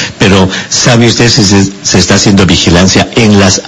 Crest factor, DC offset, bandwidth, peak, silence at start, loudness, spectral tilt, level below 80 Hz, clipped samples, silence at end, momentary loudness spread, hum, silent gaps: 6 dB; under 0.1%; 11 kHz; 0 dBFS; 0 s; -5 LUFS; -4 dB/octave; -28 dBFS; 4%; 0 s; 3 LU; none; none